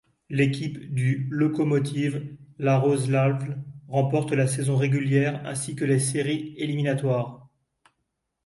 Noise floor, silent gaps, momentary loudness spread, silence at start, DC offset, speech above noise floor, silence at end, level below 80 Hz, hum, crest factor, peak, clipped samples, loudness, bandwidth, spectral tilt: -79 dBFS; none; 8 LU; 0.3 s; under 0.1%; 55 dB; 1.05 s; -62 dBFS; none; 16 dB; -10 dBFS; under 0.1%; -25 LUFS; 11.5 kHz; -6.5 dB/octave